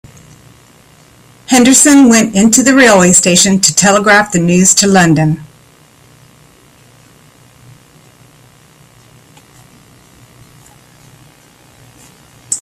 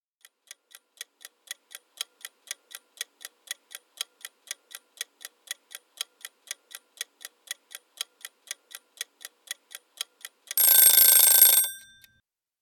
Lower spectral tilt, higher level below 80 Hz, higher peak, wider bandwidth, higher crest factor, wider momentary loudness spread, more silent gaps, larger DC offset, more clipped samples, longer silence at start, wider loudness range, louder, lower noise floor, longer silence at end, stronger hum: first, -3.5 dB/octave vs 5 dB/octave; first, -46 dBFS vs -82 dBFS; about the same, 0 dBFS vs -2 dBFS; about the same, over 20 kHz vs 19 kHz; second, 12 dB vs 26 dB; second, 7 LU vs 27 LU; neither; neither; first, 0.2% vs under 0.1%; second, 1.5 s vs 3 s; second, 10 LU vs 22 LU; first, -7 LUFS vs -16 LUFS; second, -44 dBFS vs -72 dBFS; second, 0 s vs 0.85 s; neither